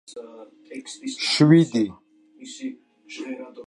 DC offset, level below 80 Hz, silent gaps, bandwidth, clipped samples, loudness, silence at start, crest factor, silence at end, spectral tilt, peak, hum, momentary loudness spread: under 0.1%; -68 dBFS; none; 11.5 kHz; under 0.1%; -19 LUFS; 0.1 s; 20 dB; 0.05 s; -5.5 dB/octave; -4 dBFS; none; 25 LU